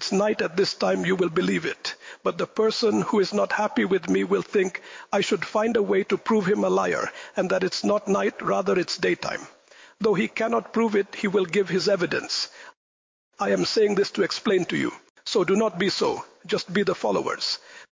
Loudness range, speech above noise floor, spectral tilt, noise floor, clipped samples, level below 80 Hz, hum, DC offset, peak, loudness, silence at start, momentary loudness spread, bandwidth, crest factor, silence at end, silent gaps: 1 LU; over 66 dB; -4.5 dB/octave; under -90 dBFS; under 0.1%; -66 dBFS; none; under 0.1%; -12 dBFS; -24 LUFS; 0 s; 7 LU; 7.6 kHz; 12 dB; 0.1 s; 12.77-13.31 s, 15.10-15.15 s